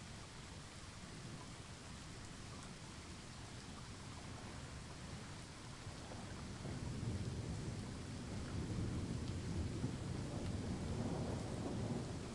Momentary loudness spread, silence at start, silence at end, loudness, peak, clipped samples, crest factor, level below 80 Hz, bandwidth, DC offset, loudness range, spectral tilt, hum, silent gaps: 9 LU; 0 s; 0 s; -47 LUFS; -28 dBFS; under 0.1%; 18 dB; -56 dBFS; 11.5 kHz; under 0.1%; 8 LU; -5.5 dB/octave; none; none